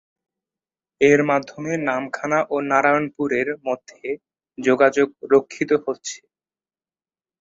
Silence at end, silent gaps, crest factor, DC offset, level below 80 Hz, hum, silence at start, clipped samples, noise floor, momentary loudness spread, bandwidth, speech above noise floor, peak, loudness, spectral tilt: 1.25 s; none; 20 dB; under 0.1%; -66 dBFS; none; 1 s; under 0.1%; under -90 dBFS; 14 LU; 7.8 kHz; over 70 dB; -2 dBFS; -20 LUFS; -5 dB/octave